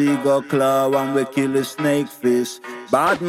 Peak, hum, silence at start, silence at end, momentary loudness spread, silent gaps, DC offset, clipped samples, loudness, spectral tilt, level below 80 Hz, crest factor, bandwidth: -4 dBFS; none; 0 s; 0 s; 4 LU; none; under 0.1%; under 0.1%; -19 LUFS; -5.5 dB/octave; -64 dBFS; 14 dB; 16 kHz